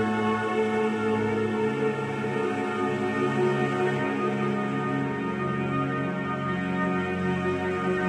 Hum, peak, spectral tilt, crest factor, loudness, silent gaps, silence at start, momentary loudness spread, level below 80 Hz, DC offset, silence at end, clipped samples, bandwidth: none; -14 dBFS; -7 dB/octave; 14 dB; -27 LUFS; none; 0 s; 3 LU; -60 dBFS; under 0.1%; 0 s; under 0.1%; 11 kHz